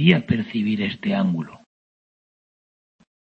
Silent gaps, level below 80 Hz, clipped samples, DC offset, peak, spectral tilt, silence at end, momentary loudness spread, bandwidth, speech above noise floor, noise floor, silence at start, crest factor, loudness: none; -56 dBFS; under 0.1%; under 0.1%; -2 dBFS; -8.5 dB/octave; 1.7 s; 8 LU; 5.2 kHz; over 69 dB; under -90 dBFS; 0 s; 22 dB; -22 LUFS